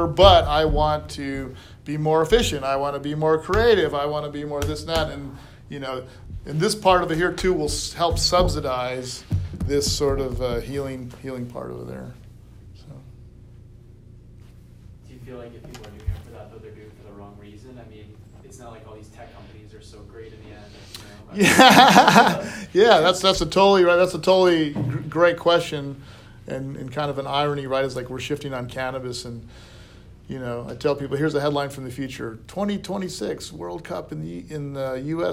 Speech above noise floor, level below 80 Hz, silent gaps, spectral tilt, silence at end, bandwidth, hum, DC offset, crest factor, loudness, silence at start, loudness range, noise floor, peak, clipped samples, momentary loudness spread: 25 dB; -38 dBFS; none; -4.5 dB/octave; 0 s; 16 kHz; none; under 0.1%; 22 dB; -20 LUFS; 0 s; 23 LU; -46 dBFS; 0 dBFS; under 0.1%; 24 LU